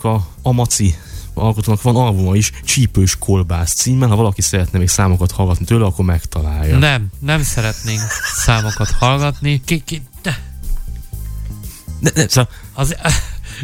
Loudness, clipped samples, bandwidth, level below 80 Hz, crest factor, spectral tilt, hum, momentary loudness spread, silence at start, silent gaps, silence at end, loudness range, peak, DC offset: -15 LUFS; under 0.1%; 17 kHz; -26 dBFS; 16 dB; -4.5 dB/octave; none; 15 LU; 0 s; none; 0 s; 5 LU; 0 dBFS; under 0.1%